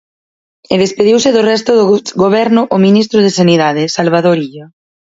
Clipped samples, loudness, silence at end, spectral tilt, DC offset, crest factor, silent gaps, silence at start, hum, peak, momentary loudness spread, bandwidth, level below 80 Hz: under 0.1%; -10 LUFS; 0.5 s; -5.5 dB/octave; under 0.1%; 10 dB; none; 0.7 s; none; 0 dBFS; 4 LU; 8 kHz; -54 dBFS